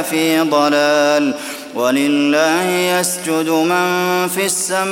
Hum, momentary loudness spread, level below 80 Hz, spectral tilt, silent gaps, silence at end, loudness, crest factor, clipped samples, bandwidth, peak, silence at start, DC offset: none; 4 LU; -64 dBFS; -3 dB/octave; none; 0 s; -15 LUFS; 14 dB; under 0.1%; 17 kHz; 0 dBFS; 0 s; under 0.1%